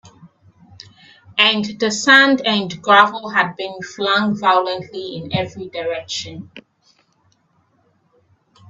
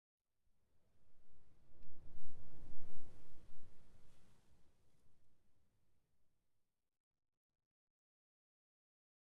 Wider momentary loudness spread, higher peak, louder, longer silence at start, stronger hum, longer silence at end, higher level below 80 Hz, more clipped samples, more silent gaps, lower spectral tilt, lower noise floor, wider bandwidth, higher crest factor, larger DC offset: first, 17 LU vs 5 LU; first, 0 dBFS vs -24 dBFS; first, -16 LUFS vs -66 LUFS; second, 0.05 s vs 1 s; neither; second, 2.1 s vs 3.95 s; about the same, -62 dBFS vs -64 dBFS; neither; neither; second, -3.5 dB/octave vs -7 dB/octave; second, -61 dBFS vs -81 dBFS; first, 8.4 kHz vs 2.2 kHz; first, 20 dB vs 14 dB; neither